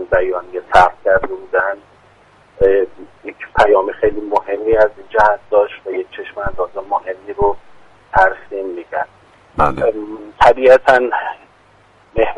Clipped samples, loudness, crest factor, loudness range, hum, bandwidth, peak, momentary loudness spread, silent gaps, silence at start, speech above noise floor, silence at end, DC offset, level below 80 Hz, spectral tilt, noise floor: under 0.1%; -15 LUFS; 16 dB; 5 LU; none; 10.5 kHz; 0 dBFS; 16 LU; none; 0 s; 35 dB; 0 s; under 0.1%; -36 dBFS; -5.5 dB/octave; -49 dBFS